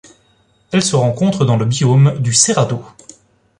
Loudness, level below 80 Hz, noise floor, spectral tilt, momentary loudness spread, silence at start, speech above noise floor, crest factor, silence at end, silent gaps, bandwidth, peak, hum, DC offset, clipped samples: -14 LUFS; -50 dBFS; -56 dBFS; -5 dB/octave; 7 LU; 0.7 s; 42 dB; 16 dB; 0.7 s; none; 11 kHz; 0 dBFS; none; under 0.1%; under 0.1%